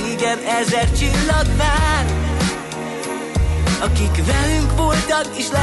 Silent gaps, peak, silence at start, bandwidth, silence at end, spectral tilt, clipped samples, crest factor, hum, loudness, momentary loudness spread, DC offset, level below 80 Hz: none; -6 dBFS; 0 s; 12 kHz; 0 s; -4.5 dB/octave; under 0.1%; 10 dB; none; -18 LUFS; 6 LU; under 0.1%; -22 dBFS